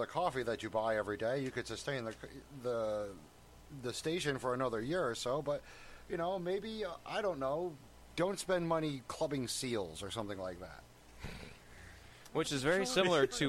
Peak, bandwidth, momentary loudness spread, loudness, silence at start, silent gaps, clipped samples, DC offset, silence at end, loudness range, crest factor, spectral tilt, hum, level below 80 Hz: -18 dBFS; 16.5 kHz; 18 LU; -37 LUFS; 0 s; none; under 0.1%; under 0.1%; 0 s; 3 LU; 18 dB; -4.5 dB/octave; none; -60 dBFS